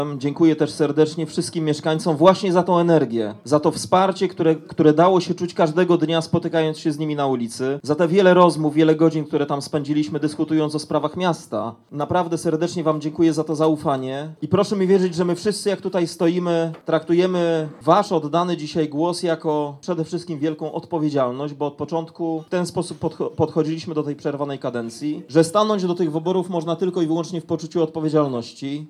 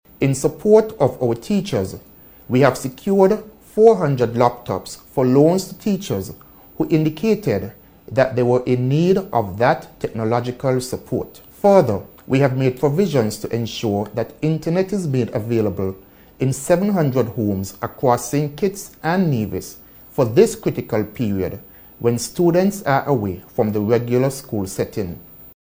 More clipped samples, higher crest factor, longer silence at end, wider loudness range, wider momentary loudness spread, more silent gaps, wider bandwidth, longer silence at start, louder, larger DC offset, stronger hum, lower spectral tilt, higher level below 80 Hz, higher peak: neither; about the same, 18 dB vs 18 dB; second, 0 s vs 0.15 s; first, 6 LU vs 3 LU; about the same, 10 LU vs 12 LU; neither; second, 13 kHz vs 17 kHz; second, 0 s vs 0.2 s; about the same, -21 LUFS vs -19 LUFS; neither; neither; about the same, -6.5 dB/octave vs -6.5 dB/octave; second, -64 dBFS vs -50 dBFS; about the same, -2 dBFS vs 0 dBFS